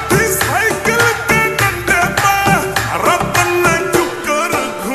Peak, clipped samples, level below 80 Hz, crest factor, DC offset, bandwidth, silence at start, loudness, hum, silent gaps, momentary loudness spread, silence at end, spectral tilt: 0 dBFS; under 0.1%; -36 dBFS; 14 dB; under 0.1%; 14 kHz; 0 s; -13 LUFS; none; none; 4 LU; 0 s; -3.5 dB/octave